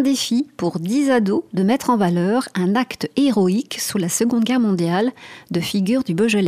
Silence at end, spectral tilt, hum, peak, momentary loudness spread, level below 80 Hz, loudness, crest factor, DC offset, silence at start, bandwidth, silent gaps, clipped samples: 0 s; -5 dB/octave; none; -6 dBFS; 6 LU; -60 dBFS; -19 LUFS; 14 dB; under 0.1%; 0 s; 16 kHz; none; under 0.1%